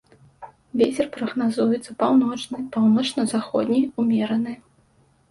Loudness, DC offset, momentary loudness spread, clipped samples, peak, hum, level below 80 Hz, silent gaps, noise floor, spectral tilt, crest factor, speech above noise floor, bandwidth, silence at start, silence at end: -22 LUFS; under 0.1%; 9 LU; under 0.1%; -6 dBFS; none; -64 dBFS; none; -60 dBFS; -5.5 dB/octave; 18 dB; 39 dB; 11.5 kHz; 0.4 s; 0.75 s